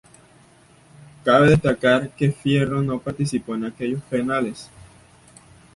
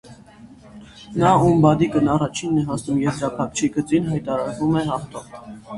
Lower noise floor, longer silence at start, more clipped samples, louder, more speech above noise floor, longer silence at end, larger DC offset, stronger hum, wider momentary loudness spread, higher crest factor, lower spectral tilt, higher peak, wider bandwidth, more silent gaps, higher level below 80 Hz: first, -52 dBFS vs -45 dBFS; first, 1.25 s vs 0.05 s; neither; about the same, -21 LUFS vs -20 LUFS; first, 32 dB vs 25 dB; first, 1.1 s vs 0 s; neither; neither; about the same, 12 LU vs 14 LU; about the same, 20 dB vs 18 dB; about the same, -6.5 dB/octave vs -6.5 dB/octave; about the same, -4 dBFS vs -2 dBFS; about the same, 11.5 kHz vs 11.5 kHz; neither; about the same, -48 dBFS vs -48 dBFS